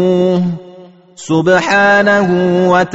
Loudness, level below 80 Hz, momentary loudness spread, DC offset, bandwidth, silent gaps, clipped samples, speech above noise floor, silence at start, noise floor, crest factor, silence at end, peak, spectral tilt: -11 LUFS; -50 dBFS; 10 LU; under 0.1%; 8 kHz; none; under 0.1%; 27 dB; 0 s; -38 dBFS; 12 dB; 0 s; 0 dBFS; -4.5 dB/octave